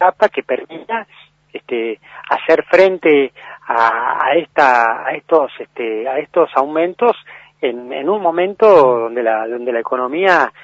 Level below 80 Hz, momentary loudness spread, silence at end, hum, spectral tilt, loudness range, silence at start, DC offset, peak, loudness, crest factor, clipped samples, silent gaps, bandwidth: -64 dBFS; 13 LU; 0.15 s; none; -5.5 dB/octave; 3 LU; 0 s; under 0.1%; 0 dBFS; -15 LUFS; 16 dB; under 0.1%; none; 7.8 kHz